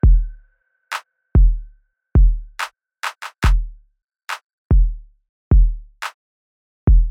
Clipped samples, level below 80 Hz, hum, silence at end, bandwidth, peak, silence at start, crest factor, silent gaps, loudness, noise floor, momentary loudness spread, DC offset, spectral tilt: under 0.1%; -18 dBFS; none; 0 s; 9.6 kHz; -4 dBFS; 0.05 s; 12 dB; 4.53-4.70 s, 5.29-5.51 s, 6.14-6.87 s; -21 LUFS; -58 dBFS; 14 LU; under 0.1%; -6.5 dB/octave